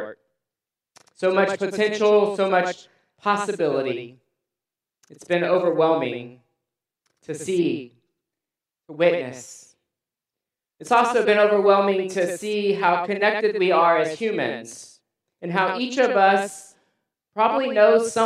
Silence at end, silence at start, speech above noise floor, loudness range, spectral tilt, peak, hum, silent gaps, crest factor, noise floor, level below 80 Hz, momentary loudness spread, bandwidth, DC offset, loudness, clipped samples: 0 s; 0 s; 68 dB; 7 LU; -4.5 dB/octave; -2 dBFS; none; none; 20 dB; -89 dBFS; -78 dBFS; 17 LU; 13 kHz; under 0.1%; -21 LUFS; under 0.1%